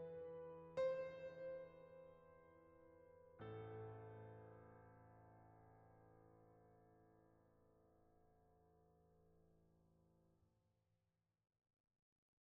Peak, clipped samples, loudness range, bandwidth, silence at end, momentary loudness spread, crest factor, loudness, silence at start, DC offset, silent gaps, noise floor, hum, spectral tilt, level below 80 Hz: -36 dBFS; under 0.1%; 14 LU; 4.9 kHz; 2.05 s; 23 LU; 22 dB; -53 LUFS; 0 s; under 0.1%; none; -90 dBFS; none; -6 dB/octave; -84 dBFS